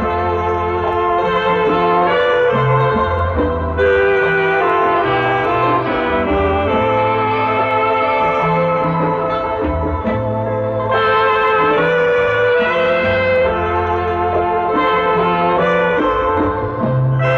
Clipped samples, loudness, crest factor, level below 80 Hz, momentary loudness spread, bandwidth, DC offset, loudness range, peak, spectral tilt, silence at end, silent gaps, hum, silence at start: under 0.1%; -15 LUFS; 10 dB; -34 dBFS; 5 LU; 6.8 kHz; under 0.1%; 2 LU; -4 dBFS; -8 dB/octave; 0 s; none; none; 0 s